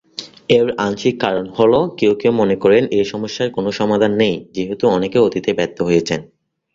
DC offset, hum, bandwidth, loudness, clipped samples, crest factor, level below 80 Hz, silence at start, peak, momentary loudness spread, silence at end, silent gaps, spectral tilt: under 0.1%; none; 7.6 kHz; -16 LUFS; under 0.1%; 14 dB; -52 dBFS; 0.2 s; -2 dBFS; 8 LU; 0.5 s; none; -6 dB/octave